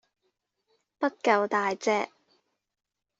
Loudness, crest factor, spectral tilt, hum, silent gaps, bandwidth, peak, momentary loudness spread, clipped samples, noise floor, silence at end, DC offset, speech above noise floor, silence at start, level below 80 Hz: -27 LUFS; 22 dB; -4 dB/octave; none; none; 8 kHz; -8 dBFS; 7 LU; under 0.1%; -78 dBFS; 1.15 s; under 0.1%; 52 dB; 1 s; -78 dBFS